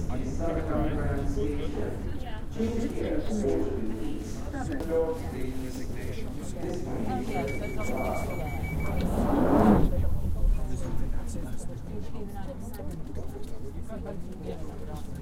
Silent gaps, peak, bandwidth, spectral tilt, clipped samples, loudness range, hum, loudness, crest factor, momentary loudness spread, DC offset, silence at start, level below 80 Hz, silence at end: none; -8 dBFS; 16 kHz; -7.5 dB/octave; under 0.1%; 11 LU; none; -31 LUFS; 20 dB; 12 LU; under 0.1%; 0 s; -34 dBFS; 0 s